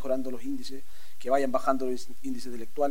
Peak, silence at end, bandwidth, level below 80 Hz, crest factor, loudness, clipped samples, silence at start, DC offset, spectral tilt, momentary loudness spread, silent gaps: -10 dBFS; 0 s; 16 kHz; -62 dBFS; 20 dB; -31 LUFS; under 0.1%; 0 s; 5%; -5 dB/octave; 14 LU; none